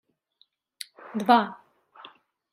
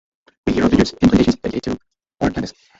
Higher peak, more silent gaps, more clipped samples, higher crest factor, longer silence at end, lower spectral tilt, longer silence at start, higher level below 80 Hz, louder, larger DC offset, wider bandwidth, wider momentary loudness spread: about the same, -4 dBFS vs -2 dBFS; neither; neither; first, 24 dB vs 16 dB; first, 1 s vs 0.3 s; second, -5 dB/octave vs -6.5 dB/octave; first, 1.15 s vs 0.45 s; second, -82 dBFS vs -36 dBFS; second, -24 LUFS vs -18 LUFS; neither; first, 15 kHz vs 7.8 kHz; first, 21 LU vs 13 LU